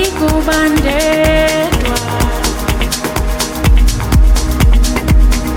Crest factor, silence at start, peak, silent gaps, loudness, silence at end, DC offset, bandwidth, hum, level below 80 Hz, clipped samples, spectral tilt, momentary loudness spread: 10 dB; 0 s; 0 dBFS; none; -13 LUFS; 0 s; under 0.1%; 17 kHz; none; -14 dBFS; under 0.1%; -5 dB/octave; 5 LU